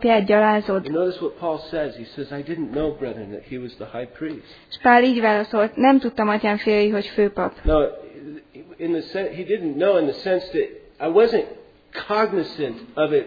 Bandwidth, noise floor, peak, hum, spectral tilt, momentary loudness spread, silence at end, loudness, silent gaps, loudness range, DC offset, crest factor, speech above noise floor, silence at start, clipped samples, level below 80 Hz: 5 kHz; -40 dBFS; -2 dBFS; none; -8 dB/octave; 17 LU; 0 s; -21 LUFS; none; 9 LU; under 0.1%; 20 dB; 20 dB; 0 s; under 0.1%; -40 dBFS